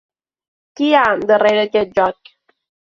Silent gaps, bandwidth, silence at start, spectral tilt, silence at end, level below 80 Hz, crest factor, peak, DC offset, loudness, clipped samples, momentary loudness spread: none; 7.4 kHz; 0.8 s; -5 dB/octave; 0.8 s; -56 dBFS; 16 dB; -2 dBFS; under 0.1%; -15 LUFS; under 0.1%; 6 LU